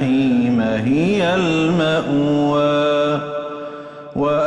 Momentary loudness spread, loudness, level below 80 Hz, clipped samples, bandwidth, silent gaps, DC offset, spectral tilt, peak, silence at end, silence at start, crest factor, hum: 12 LU; -17 LUFS; -50 dBFS; under 0.1%; 11 kHz; none; under 0.1%; -7 dB/octave; -6 dBFS; 0 s; 0 s; 10 dB; none